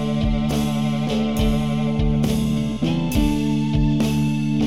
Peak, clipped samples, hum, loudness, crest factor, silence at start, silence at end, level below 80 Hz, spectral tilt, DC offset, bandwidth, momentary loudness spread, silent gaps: -6 dBFS; under 0.1%; none; -21 LUFS; 12 dB; 0 s; 0 s; -28 dBFS; -6.5 dB/octave; 1%; 16 kHz; 2 LU; none